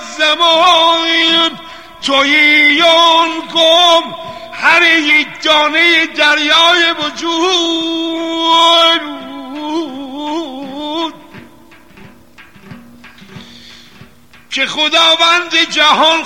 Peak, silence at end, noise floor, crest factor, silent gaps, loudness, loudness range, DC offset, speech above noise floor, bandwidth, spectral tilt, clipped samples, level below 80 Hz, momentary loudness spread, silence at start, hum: 0 dBFS; 0 s; -42 dBFS; 12 dB; none; -9 LUFS; 16 LU; 0.6%; 32 dB; 16.5 kHz; -1 dB/octave; under 0.1%; -56 dBFS; 15 LU; 0 s; none